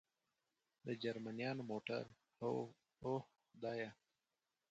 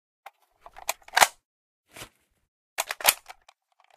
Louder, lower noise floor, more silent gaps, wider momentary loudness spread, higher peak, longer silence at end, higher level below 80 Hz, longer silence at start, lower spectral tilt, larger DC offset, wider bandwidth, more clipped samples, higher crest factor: second, -47 LUFS vs -25 LUFS; first, under -90 dBFS vs -62 dBFS; second, none vs 1.45-1.84 s, 2.48-2.76 s; second, 9 LU vs 24 LU; second, -30 dBFS vs 0 dBFS; about the same, 0.75 s vs 0.8 s; second, -84 dBFS vs -64 dBFS; about the same, 0.85 s vs 0.9 s; first, -7 dB/octave vs 1.5 dB/octave; neither; second, 8.8 kHz vs 15.5 kHz; neither; second, 18 dB vs 30 dB